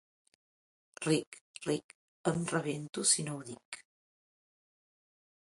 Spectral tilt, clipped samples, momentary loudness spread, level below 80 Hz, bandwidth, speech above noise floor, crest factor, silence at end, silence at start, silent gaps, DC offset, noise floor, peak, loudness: -3.5 dB/octave; under 0.1%; 19 LU; -76 dBFS; 11.5 kHz; over 56 dB; 24 dB; 1.6 s; 1 s; 1.27-1.32 s, 1.41-1.54 s, 1.84-1.89 s, 1.95-2.24 s, 2.89-2.93 s, 3.65-3.72 s; under 0.1%; under -90 dBFS; -14 dBFS; -33 LUFS